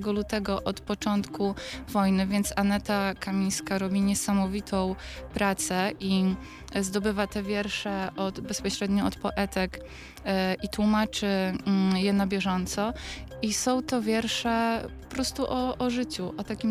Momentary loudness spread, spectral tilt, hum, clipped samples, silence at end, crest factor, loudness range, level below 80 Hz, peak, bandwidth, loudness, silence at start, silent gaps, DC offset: 7 LU; -4.5 dB/octave; none; under 0.1%; 0 s; 16 dB; 2 LU; -46 dBFS; -12 dBFS; 15.5 kHz; -28 LUFS; 0 s; none; under 0.1%